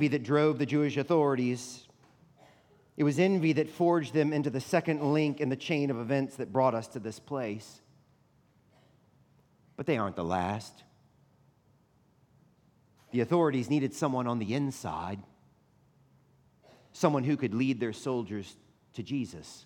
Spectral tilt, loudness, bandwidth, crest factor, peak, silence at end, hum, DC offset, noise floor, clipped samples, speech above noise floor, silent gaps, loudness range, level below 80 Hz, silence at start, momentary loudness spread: -6.5 dB/octave; -30 LUFS; 16.5 kHz; 22 dB; -10 dBFS; 0.05 s; none; under 0.1%; -66 dBFS; under 0.1%; 37 dB; none; 8 LU; -74 dBFS; 0 s; 14 LU